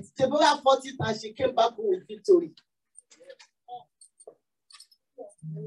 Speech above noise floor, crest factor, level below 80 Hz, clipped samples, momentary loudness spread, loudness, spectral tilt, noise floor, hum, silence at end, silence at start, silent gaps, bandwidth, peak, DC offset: 34 dB; 20 dB; -72 dBFS; under 0.1%; 24 LU; -25 LUFS; -4.5 dB/octave; -58 dBFS; none; 0 s; 0 s; none; 11.5 kHz; -8 dBFS; under 0.1%